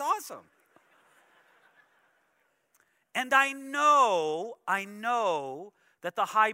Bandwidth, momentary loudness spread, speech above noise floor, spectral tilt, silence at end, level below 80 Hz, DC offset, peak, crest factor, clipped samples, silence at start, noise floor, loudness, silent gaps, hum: 16 kHz; 18 LU; 45 dB; -2 dB/octave; 0 s; under -90 dBFS; under 0.1%; -10 dBFS; 22 dB; under 0.1%; 0 s; -73 dBFS; -27 LUFS; none; none